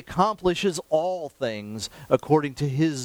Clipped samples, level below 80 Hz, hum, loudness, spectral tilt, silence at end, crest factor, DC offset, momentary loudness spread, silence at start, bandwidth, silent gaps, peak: under 0.1%; -52 dBFS; none; -25 LUFS; -5.5 dB/octave; 0 s; 18 dB; under 0.1%; 9 LU; 0.1 s; over 20 kHz; none; -6 dBFS